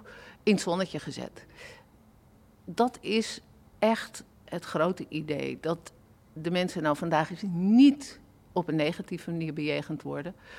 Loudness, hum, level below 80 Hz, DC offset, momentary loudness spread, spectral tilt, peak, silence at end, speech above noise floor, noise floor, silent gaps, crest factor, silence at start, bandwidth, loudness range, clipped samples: -29 LUFS; none; -64 dBFS; under 0.1%; 18 LU; -6 dB/octave; -10 dBFS; 0 s; 30 dB; -58 dBFS; none; 18 dB; 0 s; 14.5 kHz; 6 LU; under 0.1%